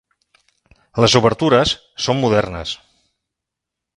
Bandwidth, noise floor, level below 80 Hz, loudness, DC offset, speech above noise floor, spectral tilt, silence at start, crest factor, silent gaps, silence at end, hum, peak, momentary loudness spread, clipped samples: 11 kHz; -83 dBFS; -44 dBFS; -17 LUFS; under 0.1%; 67 dB; -4.5 dB/octave; 0.95 s; 20 dB; none; 1.2 s; none; 0 dBFS; 15 LU; under 0.1%